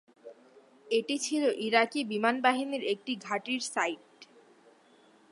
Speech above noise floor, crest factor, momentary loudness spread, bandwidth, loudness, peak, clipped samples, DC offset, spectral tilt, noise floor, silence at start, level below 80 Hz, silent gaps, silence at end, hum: 32 dB; 22 dB; 7 LU; 11.5 kHz; -30 LUFS; -8 dBFS; under 0.1%; under 0.1%; -2.5 dB/octave; -61 dBFS; 0.25 s; -88 dBFS; none; 1.1 s; none